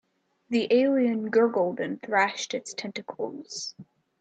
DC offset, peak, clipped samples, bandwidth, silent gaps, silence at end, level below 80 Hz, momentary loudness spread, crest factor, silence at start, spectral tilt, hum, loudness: under 0.1%; -10 dBFS; under 0.1%; 9 kHz; none; 0.4 s; -76 dBFS; 13 LU; 16 dB; 0.5 s; -4 dB/octave; none; -26 LUFS